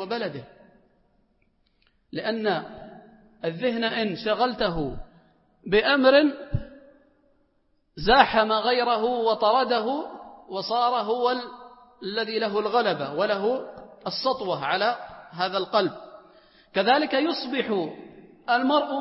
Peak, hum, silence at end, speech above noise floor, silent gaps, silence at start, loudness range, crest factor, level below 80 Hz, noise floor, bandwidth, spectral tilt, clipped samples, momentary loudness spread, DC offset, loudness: -2 dBFS; none; 0 s; 44 dB; none; 0 s; 6 LU; 22 dB; -50 dBFS; -67 dBFS; 5.8 kHz; -8.5 dB/octave; under 0.1%; 17 LU; under 0.1%; -24 LUFS